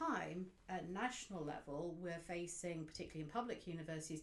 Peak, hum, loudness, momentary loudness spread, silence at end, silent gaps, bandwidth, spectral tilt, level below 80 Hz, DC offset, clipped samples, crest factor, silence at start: -28 dBFS; none; -47 LUFS; 5 LU; 0 s; none; 12 kHz; -4.5 dB/octave; -68 dBFS; under 0.1%; under 0.1%; 18 dB; 0 s